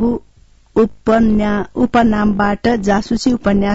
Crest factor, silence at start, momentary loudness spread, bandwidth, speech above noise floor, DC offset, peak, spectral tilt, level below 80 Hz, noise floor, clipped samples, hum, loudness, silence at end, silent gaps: 12 dB; 0 s; 5 LU; 8 kHz; 34 dB; under 0.1%; -4 dBFS; -6.5 dB/octave; -32 dBFS; -48 dBFS; under 0.1%; none; -15 LUFS; 0 s; none